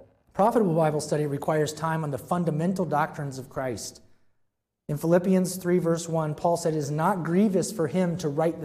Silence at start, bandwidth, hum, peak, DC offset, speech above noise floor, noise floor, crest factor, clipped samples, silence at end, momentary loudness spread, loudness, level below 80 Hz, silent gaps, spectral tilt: 0.35 s; 15.5 kHz; none; -10 dBFS; under 0.1%; 48 dB; -73 dBFS; 16 dB; under 0.1%; 0 s; 10 LU; -26 LUFS; -62 dBFS; none; -6.5 dB/octave